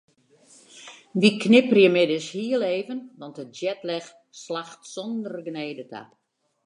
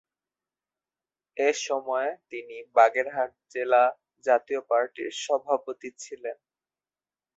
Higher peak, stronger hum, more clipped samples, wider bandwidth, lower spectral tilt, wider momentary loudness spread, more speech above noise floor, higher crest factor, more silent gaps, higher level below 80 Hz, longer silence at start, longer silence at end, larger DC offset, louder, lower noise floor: about the same, -4 dBFS vs -6 dBFS; neither; neither; first, 11 kHz vs 8.2 kHz; first, -5.5 dB/octave vs -1.5 dB/octave; first, 24 LU vs 17 LU; second, 33 dB vs over 64 dB; about the same, 22 dB vs 22 dB; neither; about the same, -78 dBFS vs -80 dBFS; second, 0.75 s vs 1.35 s; second, 0.65 s vs 1.05 s; neither; first, -23 LUFS vs -26 LUFS; second, -57 dBFS vs under -90 dBFS